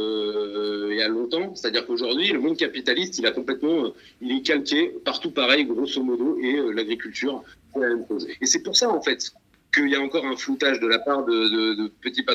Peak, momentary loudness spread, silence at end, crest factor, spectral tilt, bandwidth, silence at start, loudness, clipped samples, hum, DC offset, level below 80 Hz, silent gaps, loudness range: -4 dBFS; 8 LU; 0 s; 20 dB; -2 dB/octave; 12 kHz; 0 s; -23 LUFS; under 0.1%; none; under 0.1%; -66 dBFS; none; 2 LU